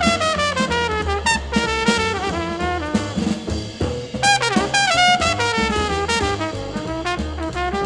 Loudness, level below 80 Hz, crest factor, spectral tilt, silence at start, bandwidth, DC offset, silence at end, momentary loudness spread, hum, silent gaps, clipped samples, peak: -19 LUFS; -34 dBFS; 18 dB; -3.5 dB/octave; 0 s; 12.5 kHz; under 0.1%; 0 s; 9 LU; none; none; under 0.1%; -2 dBFS